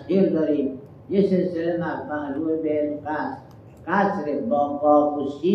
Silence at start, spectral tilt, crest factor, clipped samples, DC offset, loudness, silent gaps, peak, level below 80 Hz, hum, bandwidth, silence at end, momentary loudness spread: 0 s; -9 dB/octave; 16 dB; under 0.1%; under 0.1%; -23 LUFS; none; -8 dBFS; -62 dBFS; none; 6.4 kHz; 0 s; 10 LU